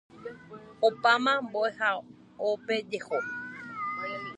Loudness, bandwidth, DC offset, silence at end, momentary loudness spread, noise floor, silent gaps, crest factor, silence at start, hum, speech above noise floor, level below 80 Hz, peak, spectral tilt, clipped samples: -29 LUFS; 10.5 kHz; under 0.1%; 0 s; 20 LU; -48 dBFS; none; 20 dB; 0.15 s; none; 20 dB; -74 dBFS; -10 dBFS; -4 dB/octave; under 0.1%